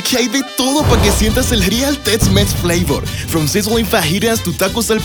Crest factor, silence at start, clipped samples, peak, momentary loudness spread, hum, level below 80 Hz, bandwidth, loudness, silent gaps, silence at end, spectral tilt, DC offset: 14 dB; 0 s; under 0.1%; 0 dBFS; 4 LU; none; -24 dBFS; over 20 kHz; -14 LUFS; none; 0 s; -4 dB/octave; under 0.1%